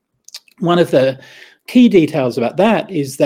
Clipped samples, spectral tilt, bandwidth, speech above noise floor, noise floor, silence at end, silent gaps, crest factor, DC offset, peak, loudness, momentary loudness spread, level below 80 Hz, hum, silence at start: under 0.1%; -6.5 dB/octave; 16 kHz; 26 dB; -40 dBFS; 0 s; none; 14 dB; under 0.1%; 0 dBFS; -14 LUFS; 10 LU; -56 dBFS; none; 0.35 s